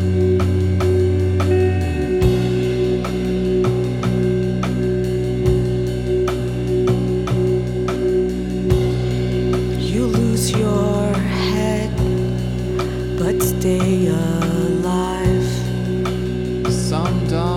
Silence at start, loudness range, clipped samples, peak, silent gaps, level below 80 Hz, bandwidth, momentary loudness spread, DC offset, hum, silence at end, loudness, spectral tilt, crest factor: 0 s; 1 LU; under 0.1%; -2 dBFS; none; -30 dBFS; 16.5 kHz; 4 LU; under 0.1%; none; 0 s; -19 LUFS; -7 dB/octave; 16 dB